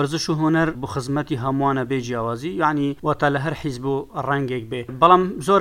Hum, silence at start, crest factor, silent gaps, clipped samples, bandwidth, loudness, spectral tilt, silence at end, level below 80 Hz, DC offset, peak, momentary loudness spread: none; 0 s; 20 dB; none; under 0.1%; 16 kHz; -21 LUFS; -6 dB/octave; 0 s; -50 dBFS; under 0.1%; 0 dBFS; 10 LU